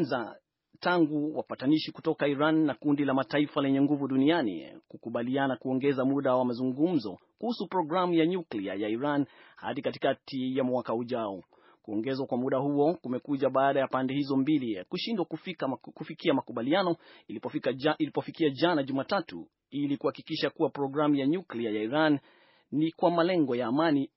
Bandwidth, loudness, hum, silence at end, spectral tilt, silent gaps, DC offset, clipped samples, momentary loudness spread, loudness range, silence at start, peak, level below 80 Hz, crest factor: 5.8 kHz; -29 LUFS; none; 0.1 s; -5 dB/octave; none; under 0.1%; under 0.1%; 9 LU; 4 LU; 0 s; -10 dBFS; -78 dBFS; 18 dB